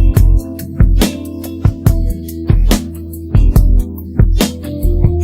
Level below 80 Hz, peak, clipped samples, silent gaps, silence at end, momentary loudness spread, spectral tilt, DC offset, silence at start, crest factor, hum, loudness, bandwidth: -14 dBFS; 0 dBFS; under 0.1%; none; 0 s; 11 LU; -6.5 dB/octave; under 0.1%; 0 s; 12 dB; none; -15 LUFS; 16.5 kHz